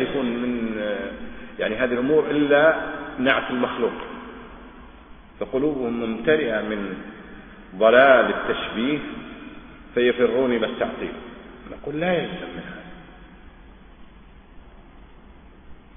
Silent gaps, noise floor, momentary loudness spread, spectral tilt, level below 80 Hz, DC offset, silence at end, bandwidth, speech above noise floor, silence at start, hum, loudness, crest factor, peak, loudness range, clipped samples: none; -47 dBFS; 23 LU; -9.5 dB/octave; -48 dBFS; under 0.1%; 0.15 s; 3.7 kHz; 26 dB; 0 s; none; -22 LUFS; 22 dB; -2 dBFS; 11 LU; under 0.1%